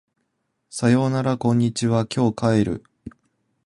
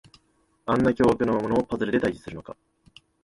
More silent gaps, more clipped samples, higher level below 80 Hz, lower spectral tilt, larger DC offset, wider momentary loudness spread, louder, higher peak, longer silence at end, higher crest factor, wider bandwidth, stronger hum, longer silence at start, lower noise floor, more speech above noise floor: neither; neither; about the same, -52 dBFS vs -50 dBFS; about the same, -6.5 dB/octave vs -7.5 dB/octave; neither; second, 6 LU vs 18 LU; first, -21 LUFS vs -24 LUFS; about the same, -6 dBFS vs -8 dBFS; second, 0.55 s vs 0.7 s; about the same, 16 dB vs 18 dB; about the same, 11.5 kHz vs 11.5 kHz; neither; about the same, 0.75 s vs 0.65 s; first, -74 dBFS vs -66 dBFS; first, 54 dB vs 43 dB